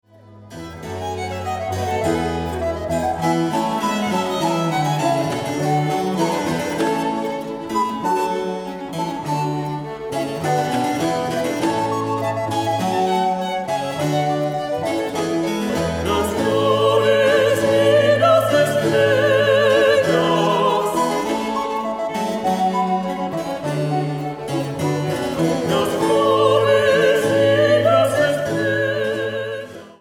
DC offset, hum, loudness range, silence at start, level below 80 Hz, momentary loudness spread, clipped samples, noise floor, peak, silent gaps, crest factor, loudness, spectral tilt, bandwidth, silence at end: under 0.1%; none; 7 LU; 0.3 s; -48 dBFS; 10 LU; under 0.1%; -43 dBFS; -4 dBFS; none; 16 dB; -19 LUFS; -5.5 dB/octave; 17 kHz; 0.1 s